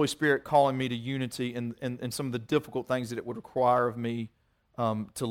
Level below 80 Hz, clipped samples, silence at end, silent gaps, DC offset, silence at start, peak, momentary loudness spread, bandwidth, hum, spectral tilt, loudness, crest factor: -64 dBFS; under 0.1%; 0 s; none; under 0.1%; 0 s; -10 dBFS; 11 LU; 17 kHz; none; -5.5 dB/octave; -30 LUFS; 18 dB